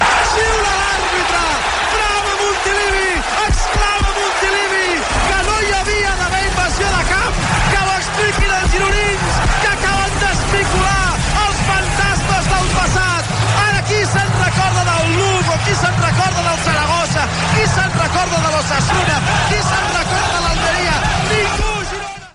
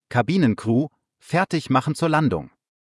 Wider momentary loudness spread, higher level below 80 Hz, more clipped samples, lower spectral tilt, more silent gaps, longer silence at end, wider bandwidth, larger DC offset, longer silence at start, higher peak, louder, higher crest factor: second, 2 LU vs 5 LU; first, -24 dBFS vs -58 dBFS; neither; second, -3.5 dB/octave vs -7 dB/octave; neither; second, 0.05 s vs 0.4 s; about the same, 11.5 kHz vs 12 kHz; neither; about the same, 0 s vs 0.1 s; about the same, -4 dBFS vs -6 dBFS; first, -15 LUFS vs -22 LUFS; about the same, 12 dB vs 16 dB